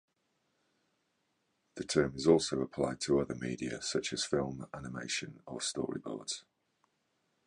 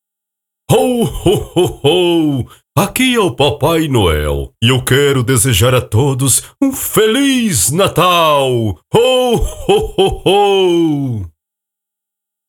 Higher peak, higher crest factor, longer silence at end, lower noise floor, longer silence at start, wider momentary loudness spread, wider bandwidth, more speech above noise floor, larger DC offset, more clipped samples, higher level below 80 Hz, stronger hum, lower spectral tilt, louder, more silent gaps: second, -12 dBFS vs 0 dBFS; first, 24 dB vs 12 dB; second, 1.05 s vs 1.2 s; about the same, -79 dBFS vs -81 dBFS; first, 1.75 s vs 0.7 s; first, 14 LU vs 6 LU; second, 11.5 kHz vs over 20 kHz; second, 45 dB vs 68 dB; neither; neither; second, -62 dBFS vs -32 dBFS; neither; about the same, -4 dB/octave vs -4.5 dB/octave; second, -34 LUFS vs -12 LUFS; neither